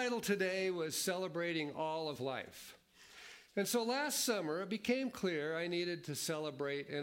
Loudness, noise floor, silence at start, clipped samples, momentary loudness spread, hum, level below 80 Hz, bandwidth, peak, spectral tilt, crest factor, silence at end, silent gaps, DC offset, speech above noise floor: -38 LUFS; -59 dBFS; 0 s; under 0.1%; 13 LU; none; -80 dBFS; 16.5 kHz; -22 dBFS; -3.5 dB/octave; 18 dB; 0 s; none; under 0.1%; 20 dB